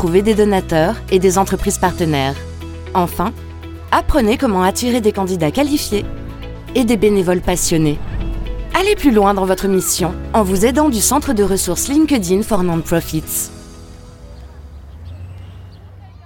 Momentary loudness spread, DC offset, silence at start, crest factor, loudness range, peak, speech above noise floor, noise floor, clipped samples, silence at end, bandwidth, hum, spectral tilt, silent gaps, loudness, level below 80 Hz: 18 LU; under 0.1%; 0 s; 16 dB; 4 LU; 0 dBFS; 22 dB; -37 dBFS; under 0.1%; 0.15 s; 17.5 kHz; none; -4.5 dB/octave; none; -16 LUFS; -30 dBFS